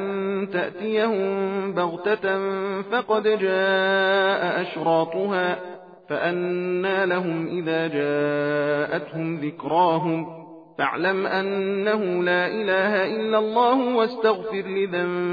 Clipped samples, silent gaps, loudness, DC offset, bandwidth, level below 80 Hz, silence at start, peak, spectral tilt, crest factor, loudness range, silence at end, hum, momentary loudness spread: under 0.1%; none; -23 LUFS; under 0.1%; 5 kHz; -72 dBFS; 0 s; -8 dBFS; -8 dB/octave; 16 dB; 3 LU; 0 s; none; 7 LU